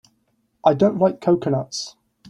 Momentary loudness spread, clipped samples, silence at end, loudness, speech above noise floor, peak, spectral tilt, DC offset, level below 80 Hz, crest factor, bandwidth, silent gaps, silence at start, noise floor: 12 LU; under 0.1%; 0.4 s; -20 LUFS; 48 dB; -2 dBFS; -6.5 dB/octave; under 0.1%; -60 dBFS; 18 dB; 11 kHz; none; 0.65 s; -67 dBFS